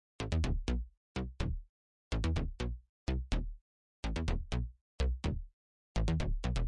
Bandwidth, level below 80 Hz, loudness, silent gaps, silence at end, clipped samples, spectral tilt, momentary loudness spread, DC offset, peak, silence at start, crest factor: 10.5 kHz; -38 dBFS; -38 LUFS; 0.97-1.15 s, 1.69-2.11 s, 2.89-3.07 s, 3.61-4.03 s, 4.81-4.99 s, 5.53-5.95 s; 0 s; under 0.1%; -6.5 dB/octave; 10 LU; under 0.1%; -20 dBFS; 0.2 s; 16 dB